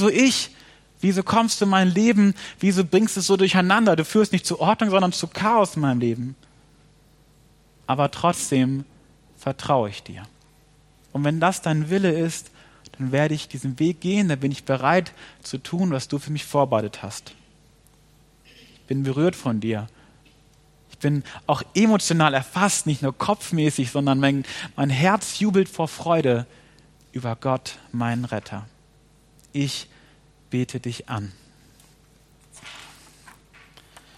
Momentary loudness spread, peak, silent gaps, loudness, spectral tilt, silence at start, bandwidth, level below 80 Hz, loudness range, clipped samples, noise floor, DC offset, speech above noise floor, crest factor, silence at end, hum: 15 LU; -2 dBFS; none; -22 LUFS; -5 dB/octave; 0 s; 13.5 kHz; -60 dBFS; 11 LU; under 0.1%; -56 dBFS; under 0.1%; 34 dB; 22 dB; 1.3 s; none